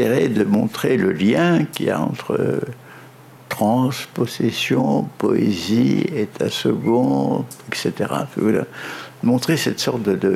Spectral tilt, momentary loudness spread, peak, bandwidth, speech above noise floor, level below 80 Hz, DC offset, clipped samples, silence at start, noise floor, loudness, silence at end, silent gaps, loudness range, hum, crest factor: -6 dB/octave; 7 LU; -6 dBFS; 16 kHz; 24 dB; -64 dBFS; under 0.1%; under 0.1%; 0 s; -43 dBFS; -20 LUFS; 0 s; none; 2 LU; none; 14 dB